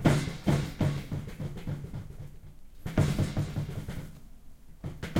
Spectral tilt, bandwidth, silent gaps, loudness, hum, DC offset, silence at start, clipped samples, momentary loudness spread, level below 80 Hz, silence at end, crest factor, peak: -6.5 dB/octave; 16 kHz; none; -32 LUFS; none; under 0.1%; 0 s; under 0.1%; 17 LU; -44 dBFS; 0 s; 20 dB; -10 dBFS